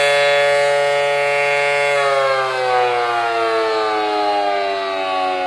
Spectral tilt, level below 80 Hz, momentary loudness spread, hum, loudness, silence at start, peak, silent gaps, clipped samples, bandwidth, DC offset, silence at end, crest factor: -2.5 dB/octave; -60 dBFS; 5 LU; none; -16 LUFS; 0 s; -4 dBFS; none; under 0.1%; 12.5 kHz; under 0.1%; 0 s; 12 dB